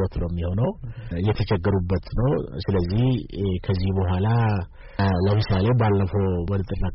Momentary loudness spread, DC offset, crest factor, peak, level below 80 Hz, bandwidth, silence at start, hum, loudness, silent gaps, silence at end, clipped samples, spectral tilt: 6 LU; under 0.1%; 10 dB; -12 dBFS; -36 dBFS; 5.8 kHz; 0 s; none; -23 LUFS; none; 0 s; under 0.1%; -7.5 dB/octave